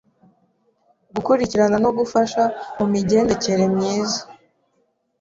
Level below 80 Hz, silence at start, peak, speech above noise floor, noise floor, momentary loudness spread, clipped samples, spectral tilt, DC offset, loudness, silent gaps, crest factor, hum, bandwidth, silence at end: -52 dBFS; 1.15 s; -4 dBFS; 49 dB; -67 dBFS; 7 LU; under 0.1%; -5.5 dB/octave; under 0.1%; -19 LUFS; none; 16 dB; none; 7.8 kHz; 0.9 s